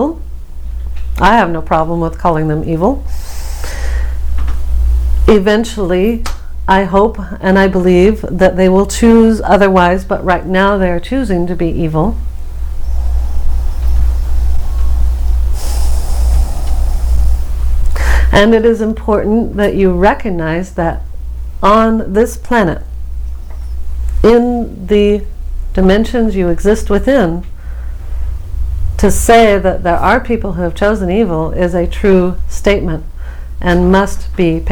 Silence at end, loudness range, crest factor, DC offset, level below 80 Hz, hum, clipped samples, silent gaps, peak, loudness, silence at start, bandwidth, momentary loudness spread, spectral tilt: 0 s; 6 LU; 12 dB; under 0.1%; -16 dBFS; none; 0.3%; none; 0 dBFS; -13 LUFS; 0 s; 18.5 kHz; 16 LU; -6.5 dB/octave